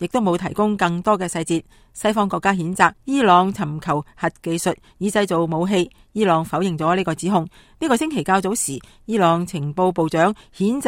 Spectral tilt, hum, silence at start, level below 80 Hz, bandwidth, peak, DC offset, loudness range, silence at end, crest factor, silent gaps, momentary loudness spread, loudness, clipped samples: -5 dB/octave; none; 0 s; -52 dBFS; 16.5 kHz; 0 dBFS; under 0.1%; 2 LU; 0 s; 20 dB; none; 8 LU; -20 LUFS; under 0.1%